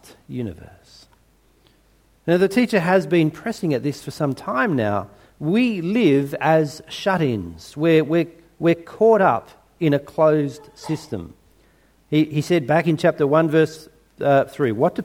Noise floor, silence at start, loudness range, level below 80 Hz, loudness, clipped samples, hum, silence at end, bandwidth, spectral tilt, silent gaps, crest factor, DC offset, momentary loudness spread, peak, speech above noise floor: -58 dBFS; 0.3 s; 3 LU; -56 dBFS; -20 LUFS; under 0.1%; none; 0 s; 16.5 kHz; -7 dB/octave; none; 18 dB; under 0.1%; 12 LU; -2 dBFS; 38 dB